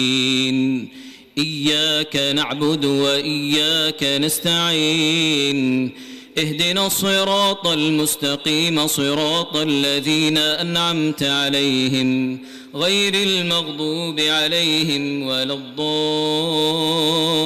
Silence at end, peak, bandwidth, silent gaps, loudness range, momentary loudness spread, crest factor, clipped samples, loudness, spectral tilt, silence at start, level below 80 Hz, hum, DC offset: 0 s; -10 dBFS; 16 kHz; none; 1 LU; 6 LU; 10 dB; under 0.1%; -18 LUFS; -3.5 dB/octave; 0 s; -60 dBFS; none; under 0.1%